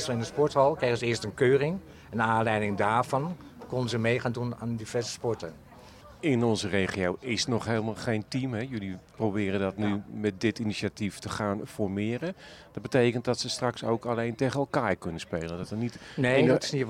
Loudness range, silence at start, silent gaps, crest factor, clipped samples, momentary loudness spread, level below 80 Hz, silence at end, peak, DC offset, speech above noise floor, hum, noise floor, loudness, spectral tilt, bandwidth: 4 LU; 0 s; none; 18 dB; under 0.1%; 11 LU; -60 dBFS; 0 s; -12 dBFS; under 0.1%; 22 dB; none; -50 dBFS; -29 LUFS; -5.5 dB/octave; 15.5 kHz